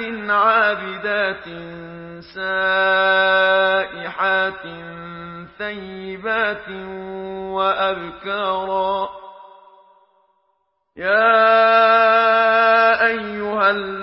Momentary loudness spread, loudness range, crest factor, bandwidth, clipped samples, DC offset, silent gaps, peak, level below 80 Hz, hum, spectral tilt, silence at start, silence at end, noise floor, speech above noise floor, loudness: 20 LU; 9 LU; 16 dB; 5.8 kHz; under 0.1%; under 0.1%; none; -4 dBFS; -56 dBFS; none; -8.5 dB/octave; 0 s; 0 s; -68 dBFS; 50 dB; -17 LUFS